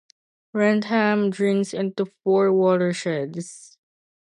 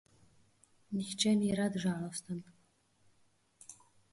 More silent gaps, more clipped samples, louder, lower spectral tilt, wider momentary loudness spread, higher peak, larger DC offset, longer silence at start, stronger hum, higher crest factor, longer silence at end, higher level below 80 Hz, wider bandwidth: neither; neither; first, -22 LUFS vs -35 LUFS; first, -6 dB/octave vs -4.5 dB/octave; second, 12 LU vs 24 LU; first, -6 dBFS vs -16 dBFS; neither; second, 0.55 s vs 0.9 s; neither; second, 16 dB vs 22 dB; first, 0.75 s vs 0.4 s; about the same, -72 dBFS vs -72 dBFS; about the same, 11 kHz vs 11.5 kHz